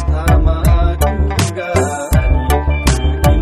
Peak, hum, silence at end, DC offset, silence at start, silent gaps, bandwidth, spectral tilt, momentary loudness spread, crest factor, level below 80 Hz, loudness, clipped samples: 0 dBFS; none; 0 s; under 0.1%; 0 s; none; 15 kHz; -6 dB/octave; 3 LU; 12 dB; -14 dBFS; -15 LUFS; under 0.1%